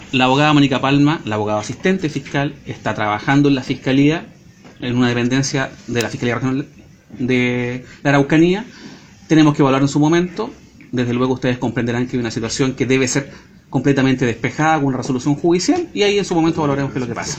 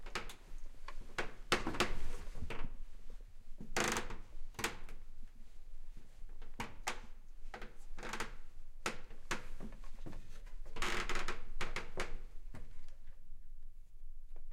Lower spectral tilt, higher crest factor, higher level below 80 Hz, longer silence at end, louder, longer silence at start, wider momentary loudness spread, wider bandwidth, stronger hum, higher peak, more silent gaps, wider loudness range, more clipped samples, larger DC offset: first, -5.5 dB/octave vs -3 dB/octave; about the same, 18 dB vs 22 dB; about the same, -46 dBFS vs -44 dBFS; about the same, 0 s vs 0 s; first, -17 LUFS vs -43 LUFS; about the same, 0 s vs 0 s; second, 10 LU vs 22 LU; about the same, 15 kHz vs 14.5 kHz; neither; first, 0 dBFS vs -16 dBFS; neither; second, 3 LU vs 8 LU; neither; neither